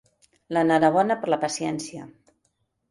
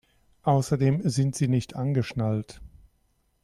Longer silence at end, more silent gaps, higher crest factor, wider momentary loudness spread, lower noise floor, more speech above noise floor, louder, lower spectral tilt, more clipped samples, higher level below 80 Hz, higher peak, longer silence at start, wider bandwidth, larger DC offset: about the same, 0.85 s vs 0.75 s; neither; about the same, 18 dB vs 16 dB; first, 15 LU vs 7 LU; first, -73 dBFS vs -69 dBFS; first, 50 dB vs 44 dB; first, -23 LUFS vs -26 LUFS; second, -5 dB/octave vs -7 dB/octave; neither; second, -66 dBFS vs -54 dBFS; first, -8 dBFS vs -12 dBFS; about the same, 0.5 s vs 0.45 s; about the same, 11.5 kHz vs 12.5 kHz; neither